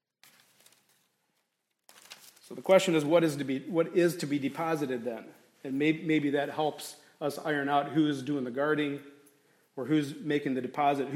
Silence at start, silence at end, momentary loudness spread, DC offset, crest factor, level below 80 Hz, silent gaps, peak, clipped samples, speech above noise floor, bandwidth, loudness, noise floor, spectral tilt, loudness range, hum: 2.1 s; 0 s; 18 LU; under 0.1%; 22 dB; -82 dBFS; none; -8 dBFS; under 0.1%; 51 dB; 16 kHz; -29 LUFS; -80 dBFS; -5.5 dB/octave; 3 LU; none